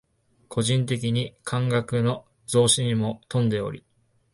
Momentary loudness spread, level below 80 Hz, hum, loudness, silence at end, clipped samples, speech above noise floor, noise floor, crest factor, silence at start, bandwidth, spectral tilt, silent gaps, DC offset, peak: 11 LU; -56 dBFS; none; -24 LUFS; 0.55 s; under 0.1%; 25 dB; -49 dBFS; 20 dB; 0.5 s; 11.5 kHz; -5 dB/octave; none; under 0.1%; -6 dBFS